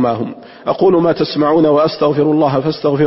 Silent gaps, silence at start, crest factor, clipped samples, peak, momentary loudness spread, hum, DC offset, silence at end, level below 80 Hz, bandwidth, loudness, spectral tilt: none; 0 s; 10 dB; under 0.1%; -2 dBFS; 10 LU; none; under 0.1%; 0 s; -50 dBFS; 5.8 kHz; -13 LUFS; -10.5 dB/octave